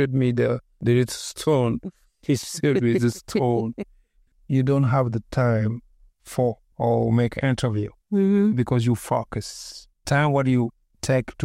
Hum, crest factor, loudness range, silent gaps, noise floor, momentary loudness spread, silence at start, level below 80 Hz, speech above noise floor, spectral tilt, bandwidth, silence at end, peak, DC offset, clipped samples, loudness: none; 16 dB; 2 LU; none; -59 dBFS; 12 LU; 0 s; -50 dBFS; 38 dB; -6.5 dB/octave; 15 kHz; 0 s; -8 dBFS; under 0.1%; under 0.1%; -23 LUFS